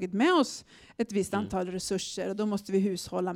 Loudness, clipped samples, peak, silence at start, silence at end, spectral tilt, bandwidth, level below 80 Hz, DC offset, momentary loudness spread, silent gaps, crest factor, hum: -30 LUFS; under 0.1%; -14 dBFS; 0 s; 0 s; -5 dB/octave; 16 kHz; -60 dBFS; under 0.1%; 9 LU; none; 16 dB; none